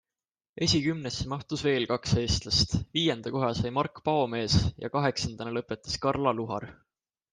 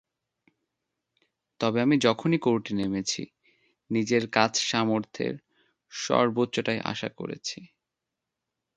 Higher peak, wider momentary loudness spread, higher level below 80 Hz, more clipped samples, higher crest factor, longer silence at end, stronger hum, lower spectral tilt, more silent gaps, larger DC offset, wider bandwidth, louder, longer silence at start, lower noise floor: second, -10 dBFS vs -4 dBFS; second, 8 LU vs 12 LU; first, -46 dBFS vs -66 dBFS; neither; about the same, 20 dB vs 24 dB; second, 0.6 s vs 1.1 s; neither; about the same, -5 dB/octave vs -4.5 dB/octave; neither; neither; about the same, 10 kHz vs 9.2 kHz; about the same, -28 LUFS vs -27 LUFS; second, 0.55 s vs 1.6 s; first, under -90 dBFS vs -86 dBFS